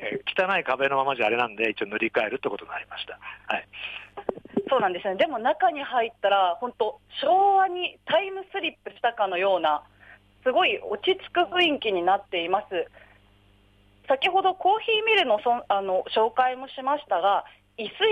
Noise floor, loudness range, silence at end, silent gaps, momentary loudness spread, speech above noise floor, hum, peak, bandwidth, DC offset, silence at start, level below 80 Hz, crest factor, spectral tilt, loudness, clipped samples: -58 dBFS; 4 LU; 0 s; none; 11 LU; 34 dB; none; -10 dBFS; 8.6 kHz; under 0.1%; 0 s; -66 dBFS; 16 dB; -5 dB/octave; -25 LUFS; under 0.1%